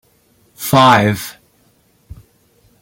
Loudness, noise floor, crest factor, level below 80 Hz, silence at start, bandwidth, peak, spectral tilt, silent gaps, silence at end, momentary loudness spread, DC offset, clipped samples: -12 LUFS; -56 dBFS; 18 dB; -50 dBFS; 0.6 s; 17 kHz; 0 dBFS; -5 dB/octave; none; 1.5 s; 17 LU; under 0.1%; under 0.1%